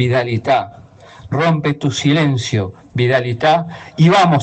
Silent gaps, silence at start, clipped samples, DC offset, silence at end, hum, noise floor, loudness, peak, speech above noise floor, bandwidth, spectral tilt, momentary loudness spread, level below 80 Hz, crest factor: none; 0 s; under 0.1%; under 0.1%; 0 s; none; -39 dBFS; -16 LUFS; -2 dBFS; 24 dB; 8.6 kHz; -6 dB/octave; 10 LU; -50 dBFS; 14 dB